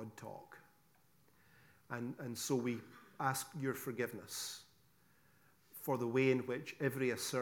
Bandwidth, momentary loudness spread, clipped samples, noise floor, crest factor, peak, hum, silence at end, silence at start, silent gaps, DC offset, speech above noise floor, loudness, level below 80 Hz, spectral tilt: 18 kHz; 18 LU; under 0.1%; -72 dBFS; 20 dB; -20 dBFS; none; 0 s; 0 s; none; under 0.1%; 33 dB; -39 LUFS; -86 dBFS; -4.5 dB/octave